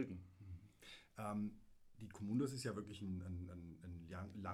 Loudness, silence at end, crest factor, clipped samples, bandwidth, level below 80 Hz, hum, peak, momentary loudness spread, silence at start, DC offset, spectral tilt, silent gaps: -48 LUFS; 0 s; 18 dB; under 0.1%; 16 kHz; -68 dBFS; none; -30 dBFS; 16 LU; 0 s; under 0.1%; -6.5 dB/octave; none